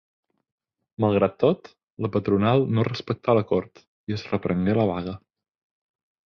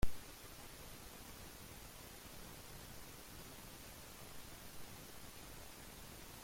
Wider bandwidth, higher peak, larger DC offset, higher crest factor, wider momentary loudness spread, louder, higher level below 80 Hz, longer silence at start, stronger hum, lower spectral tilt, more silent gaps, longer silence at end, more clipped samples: second, 6.6 kHz vs 16.5 kHz; first, -6 dBFS vs -22 dBFS; neither; about the same, 20 dB vs 24 dB; first, 12 LU vs 0 LU; first, -24 LUFS vs -54 LUFS; about the same, -52 dBFS vs -56 dBFS; first, 1 s vs 0 s; neither; first, -8.5 dB/octave vs -3.5 dB/octave; first, 1.92-1.97 s, 3.87-4.07 s vs none; first, 1.1 s vs 0 s; neither